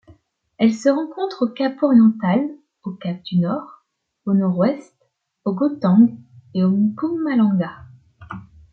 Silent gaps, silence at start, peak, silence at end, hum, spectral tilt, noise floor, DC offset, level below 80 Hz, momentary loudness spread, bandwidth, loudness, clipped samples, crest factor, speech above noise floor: none; 0.6 s; -4 dBFS; 0.3 s; none; -8 dB/octave; -63 dBFS; under 0.1%; -62 dBFS; 17 LU; 7.4 kHz; -19 LUFS; under 0.1%; 16 dB; 45 dB